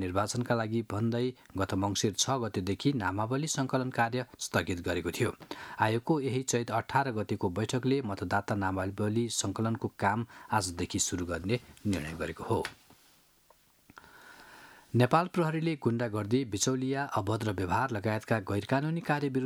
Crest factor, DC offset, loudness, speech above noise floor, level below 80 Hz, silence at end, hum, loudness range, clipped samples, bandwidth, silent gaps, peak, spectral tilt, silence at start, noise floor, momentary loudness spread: 22 dB; under 0.1%; -31 LUFS; 34 dB; -60 dBFS; 0 s; none; 4 LU; under 0.1%; 17.5 kHz; none; -8 dBFS; -5 dB/octave; 0 s; -64 dBFS; 5 LU